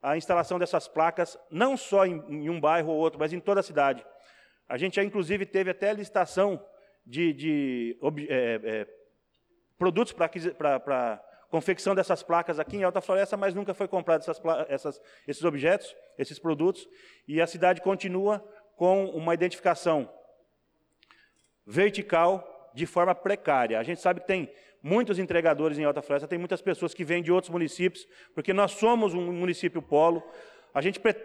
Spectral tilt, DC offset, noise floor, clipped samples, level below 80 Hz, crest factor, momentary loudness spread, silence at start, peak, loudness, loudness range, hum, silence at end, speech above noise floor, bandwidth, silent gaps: -6 dB/octave; under 0.1%; -73 dBFS; under 0.1%; -68 dBFS; 16 dB; 9 LU; 0.05 s; -12 dBFS; -28 LUFS; 3 LU; none; 0 s; 45 dB; 12 kHz; none